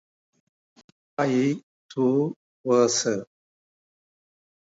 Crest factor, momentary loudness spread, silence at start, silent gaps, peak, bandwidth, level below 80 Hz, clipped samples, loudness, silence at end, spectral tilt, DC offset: 20 dB; 14 LU; 1.2 s; 1.63-1.89 s, 2.36-2.64 s; -8 dBFS; 8 kHz; -76 dBFS; under 0.1%; -24 LUFS; 1.5 s; -4.5 dB/octave; under 0.1%